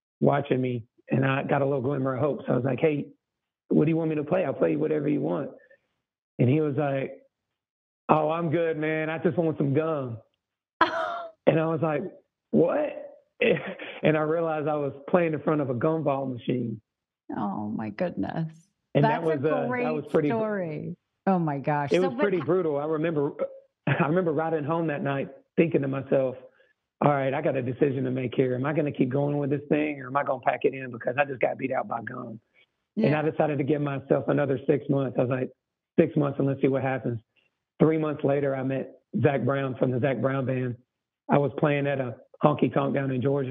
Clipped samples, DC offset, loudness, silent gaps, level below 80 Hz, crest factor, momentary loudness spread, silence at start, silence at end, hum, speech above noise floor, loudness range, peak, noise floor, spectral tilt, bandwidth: under 0.1%; under 0.1%; -26 LUFS; 6.18-6.38 s, 7.70-8.08 s, 10.73-10.80 s; -70 dBFS; 24 dB; 9 LU; 0.2 s; 0 s; none; 61 dB; 2 LU; -2 dBFS; -86 dBFS; -9.5 dB/octave; 6.2 kHz